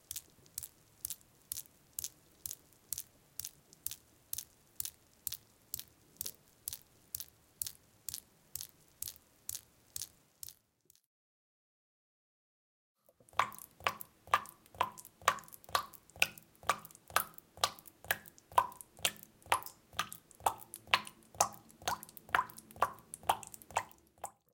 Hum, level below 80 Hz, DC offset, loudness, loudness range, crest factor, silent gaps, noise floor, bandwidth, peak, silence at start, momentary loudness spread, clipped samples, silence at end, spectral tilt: none; -72 dBFS; under 0.1%; -39 LUFS; 11 LU; 36 dB; 11.06-12.95 s; -71 dBFS; 17 kHz; -6 dBFS; 0.1 s; 14 LU; under 0.1%; 0.25 s; -0.5 dB/octave